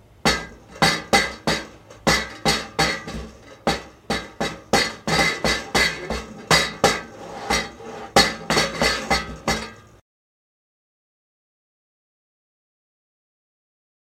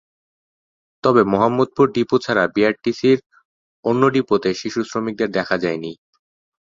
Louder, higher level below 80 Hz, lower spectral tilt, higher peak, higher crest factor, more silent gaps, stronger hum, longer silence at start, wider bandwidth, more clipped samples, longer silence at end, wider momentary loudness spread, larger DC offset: about the same, -21 LUFS vs -19 LUFS; first, -42 dBFS vs -58 dBFS; second, -2.5 dB/octave vs -6 dB/octave; about the same, 0 dBFS vs -2 dBFS; first, 24 dB vs 18 dB; second, none vs 3.26-3.30 s, 3.45-3.83 s; neither; second, 0.25 s vs 1.05 s; first, 16 kHz vs 7.6 kHz; neither; first, 4.25 s vs 0.85 s; first, 14 LU vs 8 LU; neither